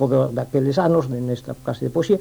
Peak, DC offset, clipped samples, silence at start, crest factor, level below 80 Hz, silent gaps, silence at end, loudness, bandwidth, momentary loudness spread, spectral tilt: -6 dBFS; under 0.1%; under 0.1%; 0 s; 14 dB; -52 dBFS; none; 0 s; -21 LUFS; over 20 kHz; 9 LU; -8 dB/octave